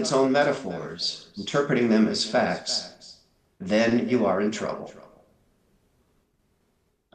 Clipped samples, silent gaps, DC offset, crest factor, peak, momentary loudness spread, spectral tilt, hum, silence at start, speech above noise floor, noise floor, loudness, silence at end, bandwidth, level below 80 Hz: under 0.1%; none; under 0.1%; 18 dB; -8 dBFS; 13 LU; -4.5 dB/octave; none; 0 s; 46 dB; -70 dBFS; -24 LUFS; 2.15 s; 10 kHz; -68 dBFS